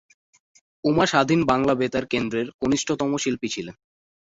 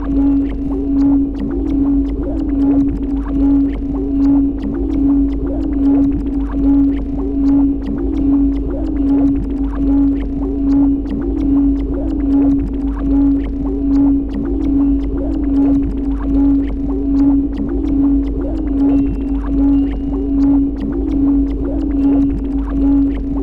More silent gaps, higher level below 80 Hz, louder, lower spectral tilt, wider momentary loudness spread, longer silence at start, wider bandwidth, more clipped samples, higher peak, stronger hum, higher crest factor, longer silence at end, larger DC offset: first, 2.54-2.59 s vs none; second, -54 dBFS vs -22 dBFS; second, -23 LUFS vs -16 LUFS; second, -4.5 dB/octave vs -10.5 dB/octave; first, 9 LU vs 6 LU; first, 0.85 s vs 0 s; first, 8 kHz vs 3.4 kHz; neither; about the same, -4 dBFS vs -4 dBFS; neither; first, 20 dB vs 12 dB; first, 0.6 s vs 0 s; neither